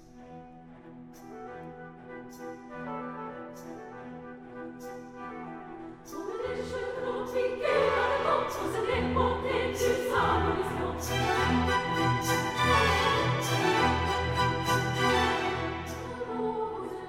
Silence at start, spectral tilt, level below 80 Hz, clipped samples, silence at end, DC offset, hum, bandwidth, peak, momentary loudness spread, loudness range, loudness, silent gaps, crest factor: 0 s; -4.5 dB/octave; -46 dBFS; under 0.1%; 0 s; under 0.1%; none; 16.5 kHz; -12 dBFS; 19 LU; 16 LU; -28 LUFS; none; 18 dB